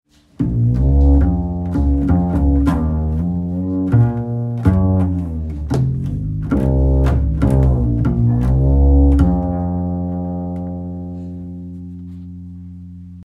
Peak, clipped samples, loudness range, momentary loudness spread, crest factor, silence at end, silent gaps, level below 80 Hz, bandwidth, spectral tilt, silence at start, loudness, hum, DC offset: 0 dBFS; under 0.1%; 7 LU; 18 LU; 16 dB; 0 s; none; -20 dBFS; 3.8 kHz; -10.5 dB/octave; 0.4 s; -17 LUFS; none; under 0.1%